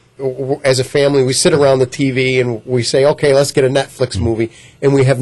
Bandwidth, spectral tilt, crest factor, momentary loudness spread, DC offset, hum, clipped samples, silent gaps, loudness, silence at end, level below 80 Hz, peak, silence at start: 12 kHz; -5 dB/octave; 12 dB; 8 LU; under 0.1%; none; under 0.1%; none; -14 LUFS; 0 s; -44 dBFS; -2 dBFS; 0.2 s